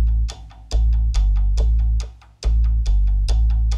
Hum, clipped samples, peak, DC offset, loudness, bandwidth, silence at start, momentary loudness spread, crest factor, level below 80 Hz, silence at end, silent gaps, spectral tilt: none; under 0.1%; -10 dBFS; under 0.1%; -21 LUFS; 7.2 kHz; 0 s; 8 LU; 8 dB; -18 dBFS; 0 s; none; -6 dB/octave